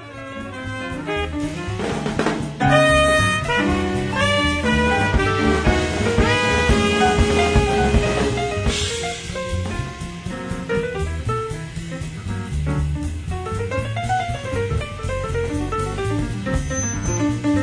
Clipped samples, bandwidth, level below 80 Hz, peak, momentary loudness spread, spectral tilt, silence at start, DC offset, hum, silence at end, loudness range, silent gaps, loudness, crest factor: under 0.1%; 10.5 kHz; -30 dBFS; -4 dBFS; 12 LU; -5 dB/octave; 0 s; under 0.1%; none; 0 s; 8 LU; none; -21 LUFS; 16 dB